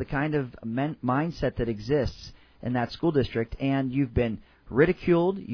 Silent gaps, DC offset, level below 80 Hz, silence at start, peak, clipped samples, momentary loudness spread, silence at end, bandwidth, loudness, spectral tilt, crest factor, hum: none; under 0.1%; -44 dBFS; 0 s; -6 dBFS; under 0.1%; 9 LU; 0 s; 5.4 kHz; -27 LUFS; -8.5 dB/octave; 20 dB; none